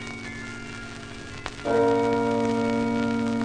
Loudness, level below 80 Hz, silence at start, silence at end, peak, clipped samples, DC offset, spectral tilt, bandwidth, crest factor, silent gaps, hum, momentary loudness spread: -25 LUFS; -50 dBFS; 0 s; 0 s; -8 dBFS; under 0.1%; under 0.1%; -6 dB/octave; 10 kHz; 16 dB; none; 50 Hz at -55 dBFS; 15 LU